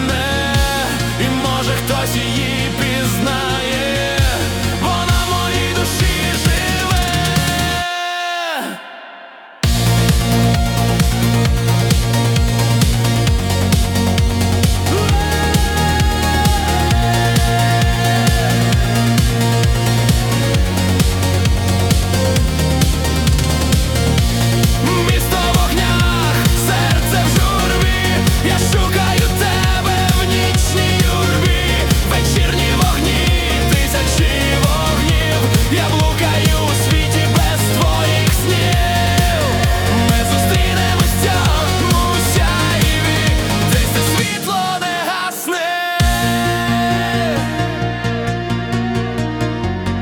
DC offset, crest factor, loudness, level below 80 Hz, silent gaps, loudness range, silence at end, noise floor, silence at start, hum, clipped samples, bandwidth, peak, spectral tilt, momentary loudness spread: under 0.1%; 12 dB; -15 LUFS; -22 dBFS; none; 3 LU; 0 s; -37 dBFS; 0 s; none; under 0.1%; 19 kHz; -2 dBFS; -4.5 dB/octave; 4 LU